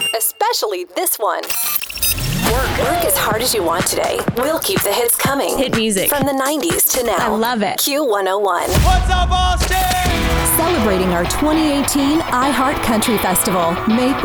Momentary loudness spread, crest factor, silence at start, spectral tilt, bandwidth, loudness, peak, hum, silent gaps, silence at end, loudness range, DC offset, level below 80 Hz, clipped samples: 3 LU; 14 dB; 0 s; -3.5 dB/octave; over 20 kHz; -16 LUFS; -4 dBFS; none; none; 0 s; 1 LU; under 0.1%; -26 dBFS; under 0.1%